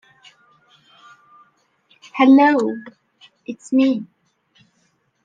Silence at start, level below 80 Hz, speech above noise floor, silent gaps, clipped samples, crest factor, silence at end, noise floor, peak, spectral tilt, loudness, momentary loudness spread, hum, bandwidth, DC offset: 2.15 s; -76 dBFS; 49 dB; none; under 0.1%; 18 dB; 1.2 s; -65 dBFS; -2 dBFS; -5.5 dB/octave; -16 LUFS; 23 LU; none; 9.2 kHz; under 0.1%